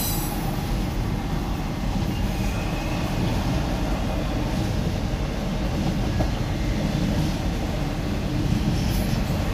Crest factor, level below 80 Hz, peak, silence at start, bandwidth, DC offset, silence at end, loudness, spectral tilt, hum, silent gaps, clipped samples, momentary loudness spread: 14 dB; -28 dBFS; -8 dBFS; 0 s; 16 kHz; under 0.1%; 0 s; -26 LUFS; -6 dB/octave; none; none; under 0.1%; 3 LU